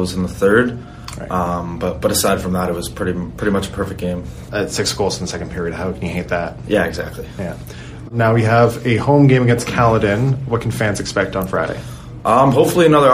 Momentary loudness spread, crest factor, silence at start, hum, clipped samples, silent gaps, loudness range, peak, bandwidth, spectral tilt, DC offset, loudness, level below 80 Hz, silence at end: 15 LU; 16 dB; 0 s; none; under 0.1%; none; 6 LU; 0 dBFS; 15.5 kHz; -5.5 dB/octave; under 0.1%; -17 LUFS; -38 dBFS; 0 s